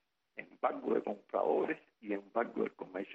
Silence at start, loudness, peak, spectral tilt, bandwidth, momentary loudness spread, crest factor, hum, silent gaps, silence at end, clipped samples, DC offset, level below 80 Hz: 0.35 s; -37 LUFS; -18 dBFS; -8 dB/octave; 5.8 kHz; 13 LU; 20 dB; none; none; 0 s; under 0.1%; under 0.1%; -82 dBFS